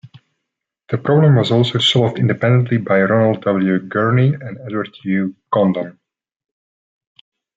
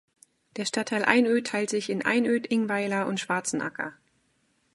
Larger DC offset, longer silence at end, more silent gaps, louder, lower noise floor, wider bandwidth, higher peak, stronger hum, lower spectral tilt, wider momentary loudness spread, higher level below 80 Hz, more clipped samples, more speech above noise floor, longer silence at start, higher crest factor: neither; first, 1.65 s vs 0.8 s; neither; first, -16 LUFS vs -26 LUFS; first, -79 dBFS vs -70 dBFS; second, 7.8 kHz vs 11.5 kHz; about the same, -2 dBFS vs -2 dBFS; neither; first, -7 dB/octave vs -4 dB/octave; about the same, 12 LU vs 11 LU; first, -58 dBFS vs -76 dBFS; neither; first, 64 dB vs 44 dB; first, 0.9 s vs 0.55 s; second, 14 dB vs 24 dB